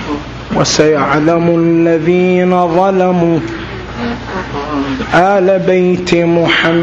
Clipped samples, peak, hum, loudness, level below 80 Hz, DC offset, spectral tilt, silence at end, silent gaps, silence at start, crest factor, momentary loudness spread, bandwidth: under 0.1%; 0 dBFS; none; -11 LUFS; -36 dBFS; under 0.1%; -5.5 dB/octave; 0 s; none; 0 s; 12 dB; 11 LU; 7.8 kHz